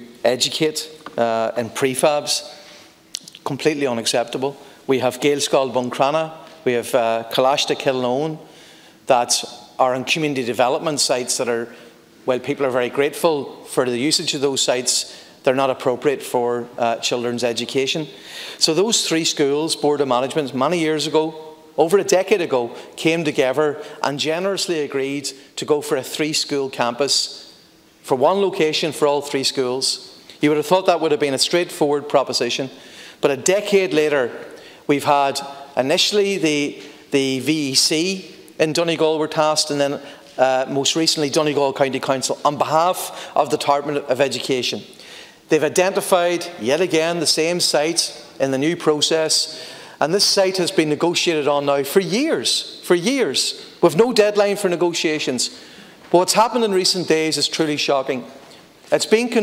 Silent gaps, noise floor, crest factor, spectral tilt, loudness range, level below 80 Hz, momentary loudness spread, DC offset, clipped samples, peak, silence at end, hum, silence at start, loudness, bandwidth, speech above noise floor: none; -50 dBFS; 18 dB; -3 dB/octave; 3 LU; -68 dBFS; 10 LU; under 0.1%; under 0.1%; -2 dBFS; 0 s; none; 0 s; -19 LUFS; 16.5 kHz; 31 dB